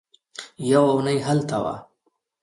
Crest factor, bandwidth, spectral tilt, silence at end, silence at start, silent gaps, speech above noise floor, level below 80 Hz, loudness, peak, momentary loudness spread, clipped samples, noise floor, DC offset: 20 dB; 11.5 kHz; -6.5 dB/octave; 0.6 s; 0.4 s; none; 50 dB; -60 dBFS; -22 LUFS; -4 dBFS; 21 LU; under 0.1%; -71 dBFS; under 0.1%